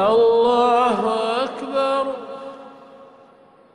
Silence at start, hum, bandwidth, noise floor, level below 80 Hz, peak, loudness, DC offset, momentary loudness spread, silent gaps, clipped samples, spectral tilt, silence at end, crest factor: 0 s; none; 10.5 kHz; -50 dBFS; -60 dBFS; -8 dBFS; -19 LUFS; under 0.1%; 19 LU; none; under 0.1%; -5 dB/octave; 0.7 s; 12 dB